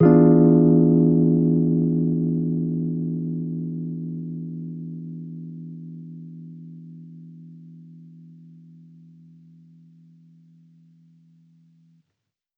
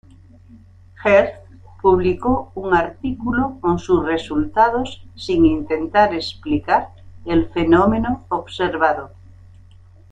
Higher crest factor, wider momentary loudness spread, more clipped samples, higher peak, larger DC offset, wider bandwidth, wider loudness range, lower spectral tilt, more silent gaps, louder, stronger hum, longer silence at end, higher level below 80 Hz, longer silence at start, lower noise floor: about the same, 18 dB vs 18 dB; first, 26 LU vs 11 LU; neither; about the same, -4 dBFS vs -2 dBFS; neither; second, 2.2 kHz vs 8.8 kHz; first, 25 LU vs 2 LU; first, -14.5 dB/octave vs -7 dB/octave; neither; about the same, -20 LUFS vs -18 LUFS; neither; first, 4.6 s vs 1.05 s; second, -56 dBFS vs -42 dBFS; second, 0 s vs 1 s; first, -80 dBFS vs -45 dBFS